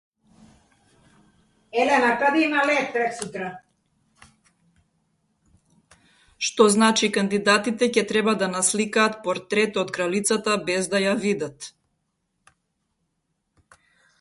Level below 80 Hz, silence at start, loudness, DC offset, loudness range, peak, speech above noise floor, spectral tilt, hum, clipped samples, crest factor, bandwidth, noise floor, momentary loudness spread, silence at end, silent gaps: -66 dBFS; 1.75 s; -22 LUFS; under 0.1%; 10 LU; -4 dBFS; 54 dB; -3 dB/octave; none; under 0.1%; 22 dB; 12 kHz; -75 dBFS; 10 LU; 2.5 s; none